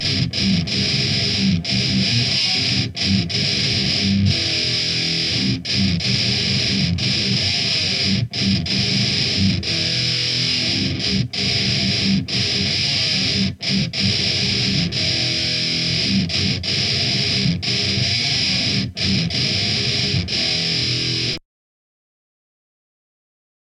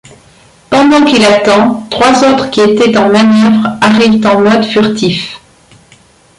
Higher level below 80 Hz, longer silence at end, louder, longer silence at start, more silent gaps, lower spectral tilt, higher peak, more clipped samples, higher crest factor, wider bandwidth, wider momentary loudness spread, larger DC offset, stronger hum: about the same, -42 dBFS vs -44 dBFS; first, 2.35 s vs 1 s; second, -18 LUFS vs -8 LUFS; second, 0 s vs 0.7 s; neither; second, -3.5 dB/octave vs -5 dB/octave; second, -4 dBFS vs 0 dBFS; neither; first, 16 dB vs 8 dB; about the same, 11 kHz vs 11.5 kHz; second, 2 LU vs 6 LU; neither; neither